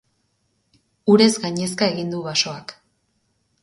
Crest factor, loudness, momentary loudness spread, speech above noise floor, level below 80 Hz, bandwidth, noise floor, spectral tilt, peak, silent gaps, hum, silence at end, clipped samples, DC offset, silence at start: 20 dB; -19 LUFS; 13 LU; 49 dB; -64 dBFS; 11.5 kHz; -69 dBFS; -4.5 dB/octave; -2 dBFS; none; none; 0.9 s; under 0.1%; under 0.1%; 1.05 s